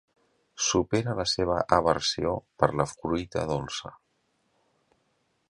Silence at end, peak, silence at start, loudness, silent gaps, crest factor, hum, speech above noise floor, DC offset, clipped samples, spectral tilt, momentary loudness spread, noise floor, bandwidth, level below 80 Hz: 1.55 s; -4 dBFS; 0.55 s; -27 LUFS; none; 26 dB; none; 46 dB; under 0.1%; under 0.1%; -4 dB/octave; 8 LU; -73 dBFS; 11.5 kHz; -50 dBFS